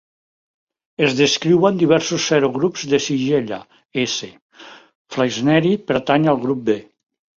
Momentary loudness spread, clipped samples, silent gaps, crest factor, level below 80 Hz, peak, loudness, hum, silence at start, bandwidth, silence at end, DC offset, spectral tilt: 12 LU; under 0.1%; 3.85-3.89 s, 4.42-4.49 s, 4.95-5.05 s; 18 dB; -58 dBFS; -2 dBFS; -18 LUFS; none; 1 s; 7.6 kHz; 0.55 s; under 0.1%; -5 dB/octave